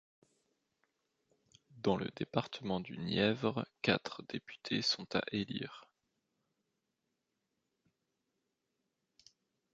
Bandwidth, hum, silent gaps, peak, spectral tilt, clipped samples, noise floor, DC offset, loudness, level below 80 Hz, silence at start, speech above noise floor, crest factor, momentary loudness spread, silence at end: 8 kHz; none; none; -14 dBFS; -5 dB/octave; under 0.1%; -86 dBFS; under 0.1%; -37 LUFS; -70 dBFS; 1.75 s; 49 dB; 28 dB; 11 LU; 3.9 s